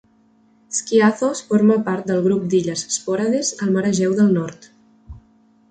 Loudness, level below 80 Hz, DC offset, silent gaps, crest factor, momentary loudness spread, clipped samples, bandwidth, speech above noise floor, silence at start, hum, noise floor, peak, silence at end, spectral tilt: -19 LUFS; -54 dBFS; under 0.1%; none; 16 dB; 7 LU; under 0.1%; 9.4 kHz; 38 dB; 0.7 s; none; -56 dBFS; -4 dBFS; 0.55 s; -5 dB/octave